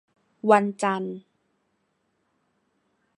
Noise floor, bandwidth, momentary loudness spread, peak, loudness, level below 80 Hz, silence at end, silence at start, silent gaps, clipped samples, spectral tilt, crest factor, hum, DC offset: -73 dBFS; 11 kHz; 15 LU; -4 dBFS; -23 LUFS; -80 dBFS; 2 s; 0.45 s; none; under 0.1%; -6 dB/octave; 24 dB; none; under 0.1%